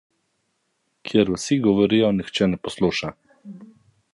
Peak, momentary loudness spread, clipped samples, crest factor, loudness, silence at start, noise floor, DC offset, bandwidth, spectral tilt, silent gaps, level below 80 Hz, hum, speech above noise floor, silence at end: -4 dBFS; 18 LU; under 0.1%; 20 dB; -21 LUFS; 1.05 s; -72 dBFS; under 0.1%; 11.5 kHz; -5.5 dB/octave; none; -52 dBFS; none; 52 dB; 0.5 s